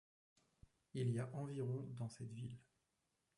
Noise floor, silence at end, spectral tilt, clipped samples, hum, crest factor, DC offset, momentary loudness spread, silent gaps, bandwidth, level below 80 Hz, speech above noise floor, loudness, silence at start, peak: -87 dBFS; 0.75 s; -7.5 dB/octave; under 0.1%; none; 18 dB; under 0.1%; 11 LU; none; 11.5 kHz; -78 dBFS; 42 dB; -46 LUFS; 0.95 s; -30 dBFS